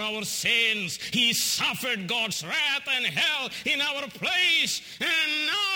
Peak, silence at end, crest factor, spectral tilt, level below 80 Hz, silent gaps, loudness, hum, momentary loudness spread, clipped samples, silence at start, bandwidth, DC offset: -10 dBFS; 0 s; 18 dB; -1 dB/octave; -68 dBFS; none; -24 LUFS; none; 6 LU; under 0.1%; 0 s; over 20 kHz; under 0.1%